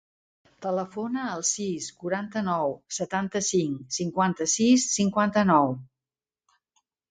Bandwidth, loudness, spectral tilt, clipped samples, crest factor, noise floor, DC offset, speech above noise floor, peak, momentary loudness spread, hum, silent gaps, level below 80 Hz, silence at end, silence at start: 9.6 kHz; -26 LUFS; -4 dB/octave; under 0.1%; 20 dB; under -90 dBFS; under 0.1%; over 65 dB; -8 dBFS; 10 LU; none; none; -66 dBFS; 1.25 s; 0.6 s